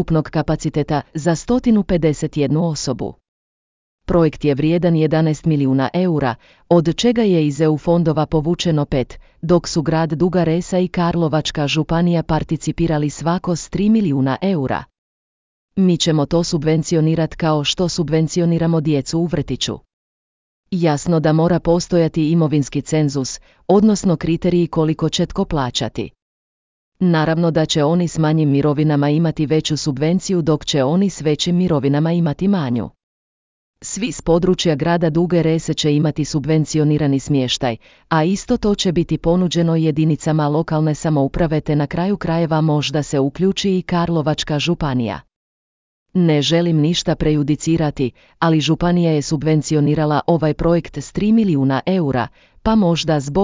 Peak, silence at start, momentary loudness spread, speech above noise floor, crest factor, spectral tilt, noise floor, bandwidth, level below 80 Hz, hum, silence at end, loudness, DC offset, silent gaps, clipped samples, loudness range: -2 dBFS; 0 s; 6 LU; over 73 dB; 14 dB; -6.5 dB/octave; under -90 dBFS; 7.6 kHz; -40 dBFS; none; 0 s; -17 LUFS; under 0.1%; 3.28-3.98 s, 14.98-15.68 s, 19.93-20.63 s, 26.22-26.92 s, 33.03-33.74 s, 45.36-46.06 s; under 0.1%; 3 LU